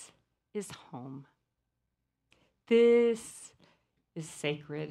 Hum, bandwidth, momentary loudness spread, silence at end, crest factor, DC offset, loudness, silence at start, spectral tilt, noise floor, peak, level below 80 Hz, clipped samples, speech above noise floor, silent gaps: none; 12.5 kHz; 24 LU; 0 s; 18 dB; under 0.1%; -29 LUFS; 0 s; -5 dB/octave; -83 dBFS; -16 dBFS; -76 dBFS; under 0.1%; 54 dB; none